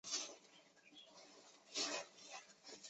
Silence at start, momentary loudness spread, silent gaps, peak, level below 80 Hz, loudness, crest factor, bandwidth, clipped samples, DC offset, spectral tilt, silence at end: 0.05 s; 21 LU; none; -28 dBFS; under -90 dBFS; -46 LUFS; 22 dB; 8.2 kHz; under 0.1%; under 0.1%; 0.5 dB/octave; 0 s